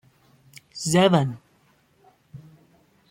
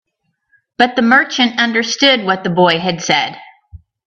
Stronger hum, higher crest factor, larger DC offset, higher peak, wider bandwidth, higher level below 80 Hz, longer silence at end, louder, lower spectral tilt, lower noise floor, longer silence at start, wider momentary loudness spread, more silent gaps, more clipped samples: neither; first, 22 dB vs 16 dB; neither; second, -4 dBFS vs 0 dBFS; first, 16 kHz vs 8.2 kHz; second, -62 dBFS vs -52 dBFS; first, 0.75 s vs 0.3 s; second, -21 LUFS vs -13 LUFS; first, -5 dB/octave vs -3.5 dB/octave; second, -62 dBFS vs -68 dBFS; about the same, 0.75 s vs 0.8 s; first, 24 LU vs 5 LU; neither; neither